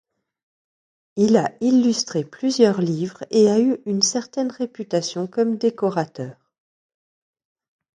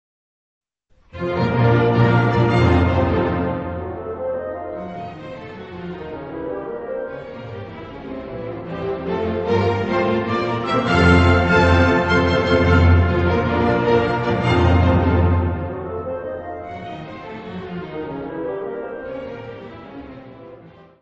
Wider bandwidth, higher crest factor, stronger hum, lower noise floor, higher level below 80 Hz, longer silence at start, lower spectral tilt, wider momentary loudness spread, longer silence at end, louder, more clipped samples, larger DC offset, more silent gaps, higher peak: first, 10 kHz vs 8.2 kHz; about the same, 20 dB vs 18 dB; neither; first, under -90 dBFS vs -57 dBFS; second, -68 dBFS vs -34 dBFS; about the same, 1.15 s vs 1.15 s; second, -5 dB/octave vs -8 dB/octave; second, 10 LU vs 19 LU; first, 1.65 s vs 0.3 s; about the same, -20 LUFS vs -19 LUFS; neither; neither; neither; about the same, -2 dBFS vs -2 dBFS